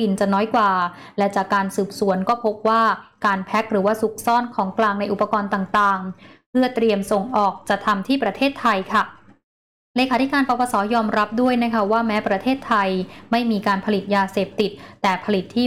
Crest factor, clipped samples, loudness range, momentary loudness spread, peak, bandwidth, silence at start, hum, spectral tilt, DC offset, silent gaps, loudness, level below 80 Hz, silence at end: 12 dB; under 0.1%; 1 LU; 5 LU; -8 dBFS; 16 kHz; 0 s; none; -5.5 dB/octave; 0.2%; 6.46-6.53 s, 9.43-9.94 s; -20 LUFS; -56 dBFS; 0 s